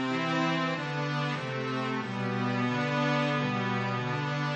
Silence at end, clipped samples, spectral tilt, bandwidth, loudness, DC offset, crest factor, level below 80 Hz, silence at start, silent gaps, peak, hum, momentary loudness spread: 0 s; under 0.1%; -6 dB/octave; 8.6 kHz; -30 LUFS; under 0.1%; 14 dB; -72 dBFS; 0 s; none; -16 dBFS; none; 5 LU